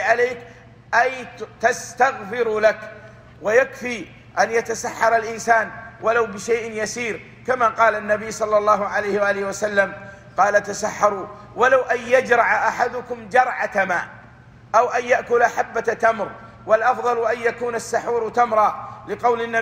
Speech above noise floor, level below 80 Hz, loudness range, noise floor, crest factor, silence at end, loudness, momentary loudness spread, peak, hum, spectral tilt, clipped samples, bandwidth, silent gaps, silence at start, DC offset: 25 dB; -56 dBFS; 2 LU; -45 dBFS; 18 dB; 0 s; -20 LUFS; 12 LU; -4 dBFS; none; -3.5 dB/octave; under 0.1%; 16 kHz; none; 0 s; under 0.1%